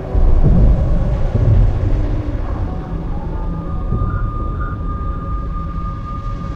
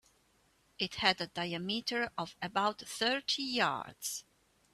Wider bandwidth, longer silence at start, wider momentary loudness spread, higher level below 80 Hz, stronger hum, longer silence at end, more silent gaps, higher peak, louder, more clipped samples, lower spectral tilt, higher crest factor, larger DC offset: second, 4.9 kHz vs 15.5 kHz; second, 0 s vs 0.8 s; about the same, 10 LU vs 9 LU; first, -18 dBFS vs -72 dBFS; neither; second, 0 s vs 0.55 s; neither; first, -2 dBFS vs -10 dBFS; first, -19 LUFS vs -34 LUFS; neither; first, -10 dB/octave vs -2.5 dB/octave; second, 12 dB vs 26 dB; neither